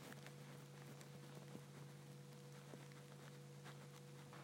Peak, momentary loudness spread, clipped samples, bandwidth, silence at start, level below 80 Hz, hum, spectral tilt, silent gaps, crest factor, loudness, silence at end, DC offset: -38 dBFS; 2 LU; under 0.1%; 16 kHz; 0 s; under -90 dBFS; none; -5 dB/octave; none; 20 dB; -58 LUFS; 0 s; under 0.1%